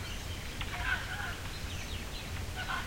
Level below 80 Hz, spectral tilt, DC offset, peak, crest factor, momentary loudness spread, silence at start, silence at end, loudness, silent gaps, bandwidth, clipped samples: -44 dBFS; -3.5 dB/octave; 0.2%; -20 dBFS; 18 dB; 6 LU; 0 s; 0 s; -38 LUFS; none; 16.5 kHz; under 0.1%